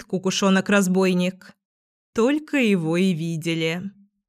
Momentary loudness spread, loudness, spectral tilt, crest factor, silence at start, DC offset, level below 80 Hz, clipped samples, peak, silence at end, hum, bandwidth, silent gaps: 8 LU; -21 LUFS; -5.5 dB/octave; 16 dB; 0 s; under 0.1%; -68 dBFS; under 0.1%; -6 dBFS; 0.4 s; none; 15 kHz; 1.65-2.13 s